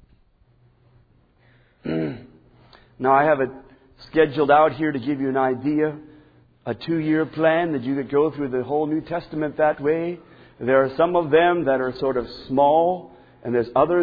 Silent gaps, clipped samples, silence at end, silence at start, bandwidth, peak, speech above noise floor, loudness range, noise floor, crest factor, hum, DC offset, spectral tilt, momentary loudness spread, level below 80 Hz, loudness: none; under 0.1%; 0 s; 1.85 s; 5 kHz; -4 dBFS; 38 dB; 5 LU; -58 dBFS; 18 dB; none; under 0.1%; -9.5 dB/octave; 13 LU; -54 dBFS; -21 LUFS